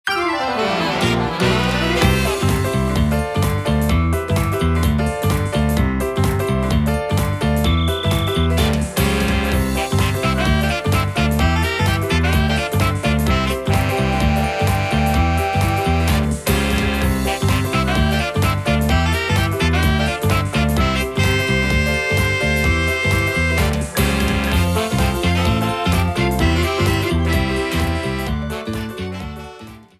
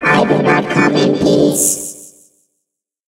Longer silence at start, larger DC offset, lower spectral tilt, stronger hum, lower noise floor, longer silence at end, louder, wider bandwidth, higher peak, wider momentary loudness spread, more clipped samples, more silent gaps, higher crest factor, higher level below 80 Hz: about the same, 0.05 s vs 0 s; neither; first, -5.5 dB/octave vs -4 dB/octave; neither; second, -38 dBFS vs -75 dBFS; second, 0.15 s vs 1 s; second, -18 LUFS vs -12 LUFS; about the same, 16 kHz vs 16 kHz; about the same, -2 dBFS vs 0 dBFS; second, 3 LU vs 9 LU; neither; neither; about the same, 16 dB vs 14 dB; first, -24 dBFS vs -48 dBFS